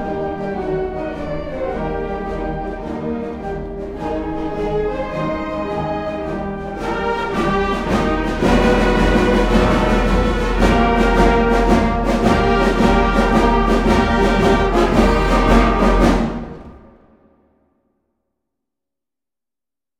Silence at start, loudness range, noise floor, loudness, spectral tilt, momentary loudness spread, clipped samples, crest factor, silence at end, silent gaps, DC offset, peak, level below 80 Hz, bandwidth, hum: 0 s; 9 LU; under -90 dBFS; -17 LUFS; -6.5 dB/octave; 11 LU; under 0.1%; 16 dB; 3.2 s; none; under 0.1%; 0 dBFS; -24 dBFS; 12 kHz; none